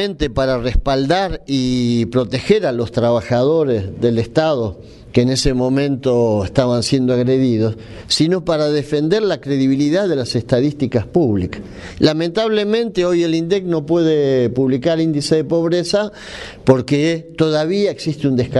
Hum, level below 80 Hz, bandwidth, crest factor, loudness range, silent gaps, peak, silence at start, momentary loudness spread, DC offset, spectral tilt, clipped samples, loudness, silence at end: none; -34 dBFS; 11.5 kHz; 16 dB; 1 LU; none; 0 dBFS; 0 s; 4 LU; under 0.1%; -6 dB/octave; under 0.1%; -17 LUFS; 0 s